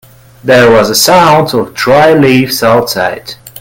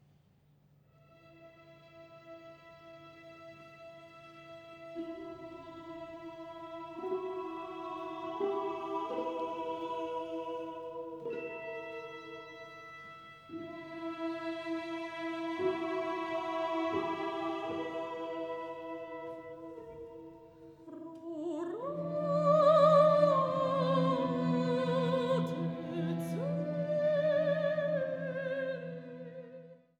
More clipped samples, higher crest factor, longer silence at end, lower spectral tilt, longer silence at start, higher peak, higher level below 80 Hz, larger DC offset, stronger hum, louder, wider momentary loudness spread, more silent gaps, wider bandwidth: first, 1% vs under 0.1%; second, 8 dB vs 22 dB; second, 0 s vs 0.25 s; second, -4 dB/octave vs -7.5 dB/octave; second, 0.45 s vs 1.25 s; first, 0 dBFS vs -14 dBFS; first, -40 dBFS vs -74 dBFS; neither; neither; first, -7 LUFS vs -34 LUFS; second, 10 LU vs 22 LU; neither; first, over 20 kHz vs 12 kHz